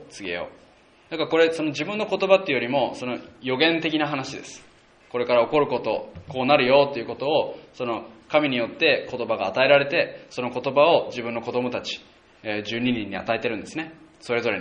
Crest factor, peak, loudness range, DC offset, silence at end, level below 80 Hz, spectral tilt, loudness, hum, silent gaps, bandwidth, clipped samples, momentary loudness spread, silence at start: 22 dB; -2 dBFS; 3 LU; under 0.1%; 0 s; -62 dBFS; -5 dB/octave; -23 LUFS; none; none; 10 kHz; under 0.1%; 14 LU; 0 s